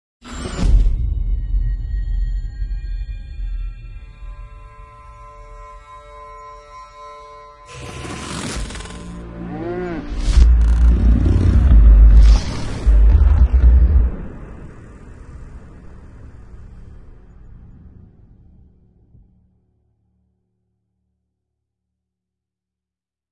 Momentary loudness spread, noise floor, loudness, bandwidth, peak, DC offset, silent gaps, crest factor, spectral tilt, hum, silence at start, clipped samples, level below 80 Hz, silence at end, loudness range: 26 LU; -89 dBFS; -17 LUFS; 10.5 kHz; 0 dBFS; under 0.1%; none; 18 dB; -7 dB/octave; none; 0.25 s; under 0.1%; -18 dBFS; 5.75 s; 25 LU